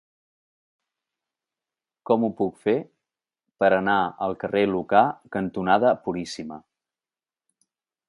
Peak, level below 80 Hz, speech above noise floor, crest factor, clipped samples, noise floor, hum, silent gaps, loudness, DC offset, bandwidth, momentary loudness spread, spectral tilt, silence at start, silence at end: -4 dBFS; -62 dBFS; over 67 dB; 22 dB; under 0.1%; under -90 dBFS; none; none; -23 LUFS; under 0.1%; 11.5 kHz; 11 LU; -6.5 dB/octave; 2.1 s; 1.5 s